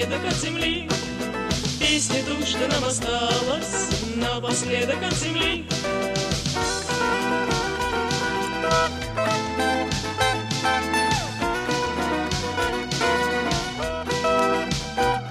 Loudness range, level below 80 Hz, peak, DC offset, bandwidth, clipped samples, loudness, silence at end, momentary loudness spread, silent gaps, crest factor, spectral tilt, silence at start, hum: 1 LU; -40 dBFS; -8 dBFS; under 0.1%; 15.5 kHz; under 0.1%; -23 LUFS; 0 s; 4 LU; none; 16 dB; -3.5 dB/octave; 0 s; none